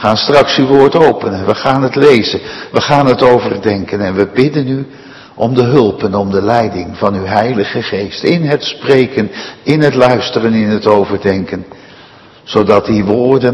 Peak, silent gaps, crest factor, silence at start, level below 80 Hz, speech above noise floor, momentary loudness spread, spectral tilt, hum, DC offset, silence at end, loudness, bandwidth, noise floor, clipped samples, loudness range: 0 dBFS; none; 12 dB; 0 s; -46 dBFS; 28 dB; 9 LU; -6.5 dB/octave; none; under 0.1%; 0 s; -11 LUFS; 10.5 kHz; -38 dBFS; 1%; 3 LU